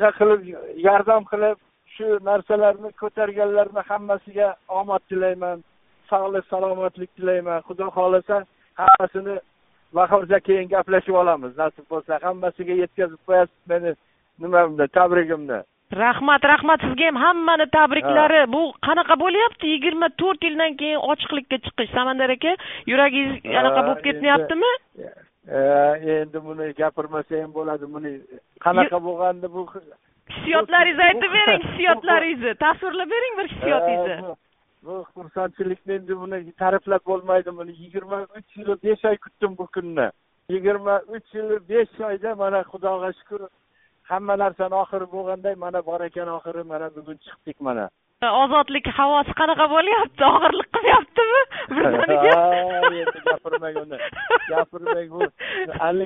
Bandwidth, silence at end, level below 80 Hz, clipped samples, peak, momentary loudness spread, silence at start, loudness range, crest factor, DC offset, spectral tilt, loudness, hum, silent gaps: 4 kHz; 0 s; -56 dBFS; under 0.1%; 0 dBFS; 15 LU; 0 s; 8 LU; 20 dB; under 0.1%; -1.5 dB/octave; -20 LUFS; none; none